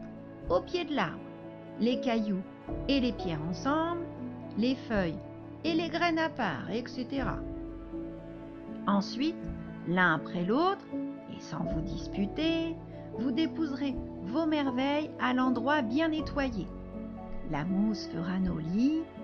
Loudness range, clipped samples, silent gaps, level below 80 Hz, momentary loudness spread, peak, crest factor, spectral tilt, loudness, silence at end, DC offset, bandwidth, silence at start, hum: 3 LU; under 0.1%; none; -48 dBFS; 13 LU; -14 dBFS; 18 dB; -6.5 dB/octave; -32 LUFS; 0 s; under 0.1%; 6.8 kHz; 0 s; none